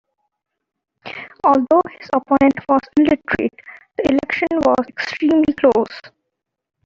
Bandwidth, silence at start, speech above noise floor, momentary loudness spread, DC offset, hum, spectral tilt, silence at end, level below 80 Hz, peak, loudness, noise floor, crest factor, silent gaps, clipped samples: 7.4 kHz; 1.05 s; 62 dB; 12 LU; under 0.1%; none; -6.5 dB/octave; 0.8 s; -52 dBFS; -2 dBFS; -17 LUFS; -79 dBFS; 16 dB; none; under 0.1%